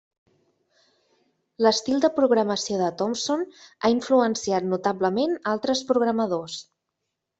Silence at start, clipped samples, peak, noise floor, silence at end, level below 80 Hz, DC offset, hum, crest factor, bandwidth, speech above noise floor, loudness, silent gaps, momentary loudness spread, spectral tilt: 1.6 s; under 0.1%; -6 dBFS; -81 dBFS; 0.8 s; -66 dBFS; under 0.1%; none; 20 dB; 8.2 kHz; 58 dB; -23 LUFS; none; 6 LU; -4 dB/octave